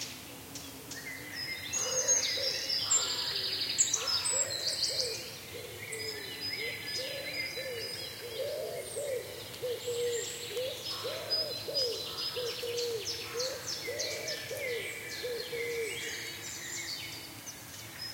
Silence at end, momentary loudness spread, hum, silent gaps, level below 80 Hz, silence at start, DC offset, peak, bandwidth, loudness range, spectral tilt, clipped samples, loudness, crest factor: 0 s; 14 LU; none; none; -70 dBFS; 0 s; under 0.1%; -14 dBFS; 16.5 kHz; 8 LU; -0.5 dB/octave; under 0.1%; -33 LUFS; 22 dB